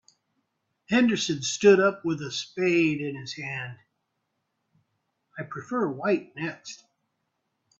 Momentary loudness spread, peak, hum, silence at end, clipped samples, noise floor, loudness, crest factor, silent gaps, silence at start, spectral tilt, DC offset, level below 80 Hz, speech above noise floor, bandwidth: 20 LU; -6 dBFS; none; 1.05 s; under 0.1%; -79 dBFS; -25 LUFS; 22 dB; none; 0.9 s; -4.5 dB/octave; under 0.1%; -68 dBFS; 53 dB; 8 kHz